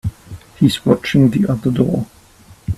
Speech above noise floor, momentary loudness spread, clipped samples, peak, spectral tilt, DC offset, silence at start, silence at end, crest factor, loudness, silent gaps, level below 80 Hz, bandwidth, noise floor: 31 dB; 15 LU; under 0.1%; 0 dBFS; -7 dB/octave; under 0.1%; 0.05 s; 0 s; 16 dB; -16 LUFS; none; -40 dBFS; 14 kHz; -45 dBFS